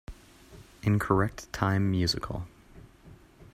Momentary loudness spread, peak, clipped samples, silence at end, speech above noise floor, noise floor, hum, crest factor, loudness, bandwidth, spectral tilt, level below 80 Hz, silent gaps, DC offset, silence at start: 14 LU; -8 dBFS; under 0.1%; 0.1 s; 26 dB; -54 dBFS; none; 22 dB; -29 LUFS; 15 kHz; -6 dB/octave; -50 dBFS; none; under 0.1%; 0.1 s